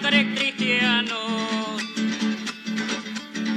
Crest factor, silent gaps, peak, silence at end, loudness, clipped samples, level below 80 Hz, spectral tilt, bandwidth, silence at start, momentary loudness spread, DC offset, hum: 18 dB; none; -6 dBFS; 0 s; -24 LUFS; under 0.1%; -76 dBFS; -3.5 dB/octave; 10 kHz; 0 s; 10 LU; under 0.1%; none